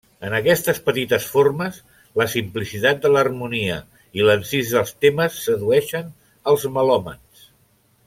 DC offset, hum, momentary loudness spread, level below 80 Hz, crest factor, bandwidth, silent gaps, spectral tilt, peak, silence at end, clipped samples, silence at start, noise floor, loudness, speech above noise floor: under 0.1%; none; 11 LU; -54 dBFS; 18 dB; 16.5 kHz; none; -4.5 dB/octave; -2 dBFS; 0.9 s; under 0.1%; 0.2 s; -59 dBFS; -20 LUFS; 40 dB